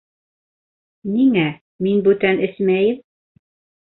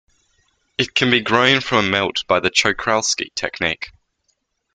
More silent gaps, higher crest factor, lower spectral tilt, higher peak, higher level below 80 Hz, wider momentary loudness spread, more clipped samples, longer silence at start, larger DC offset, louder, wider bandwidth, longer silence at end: first, 1.61-1.79 s vs none; about the same, 16 dB vs 20 dB; first, -11.5 dB/octave vs -3 dB/octave; about the same, -2 dBFS vs 0 dBFS; second, -60 dBFS vs -52 dBFS; about the same, 9 LU vs 10 LU; neither; first, 1.05 s vs 0.8 s; neither; about the same, -18 LUFS vs -17 LUFS; second, 4.1 kHz vs 10 kHz; about the same, 0.9 s vs 0.85 s